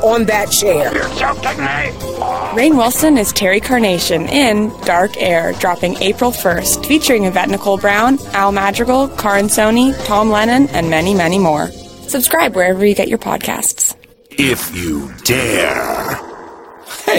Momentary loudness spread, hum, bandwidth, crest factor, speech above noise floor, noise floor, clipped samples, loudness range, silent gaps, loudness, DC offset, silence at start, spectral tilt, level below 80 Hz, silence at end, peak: 8 LU; none; 17.5 kHz; 14 dB; 21 dB; -34 dBFS; under 0.1%; 2 LU; none; -13 LUFS; under 0.1%; 0 s; -3.5 dB/octave; -38 dBFS; 0 s; 0 dBFS